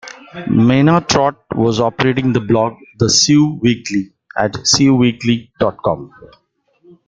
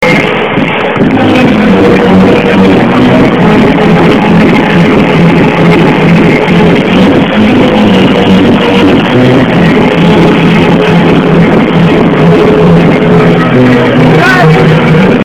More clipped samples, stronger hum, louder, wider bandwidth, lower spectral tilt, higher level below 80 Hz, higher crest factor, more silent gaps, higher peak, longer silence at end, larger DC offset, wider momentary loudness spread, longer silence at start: second, under 0.1% vs 6%; neither; second, -14 LUFS vs -4 LUFS; second, 9.4 kHz vs 11 kHz; second, -4.5 dB/octave vs -7.5 dB/octave; second, -46 dBFS vs -28 dBFS; first, 16 dB vs 4 dB; neither; about the same, 0 dBFS vs 0 dBFS; first, 1 s vs 0 s; second, under 0.1% vs 2%; first, 10 LU vs 1 LU; about the same, 0.05 s vs 0 s